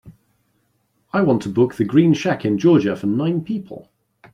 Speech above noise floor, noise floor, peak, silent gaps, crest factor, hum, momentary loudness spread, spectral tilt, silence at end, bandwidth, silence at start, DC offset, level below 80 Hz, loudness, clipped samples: 49 dB; -66 dBFS; -2 dBFS; none; 18 dB; none; 12 LU; -7.5 dB/octave; 0.55 s; 10.5 kHz; 0.05 s; under 0.1%; -58 dBFS; -18 LUFS; under 0.1%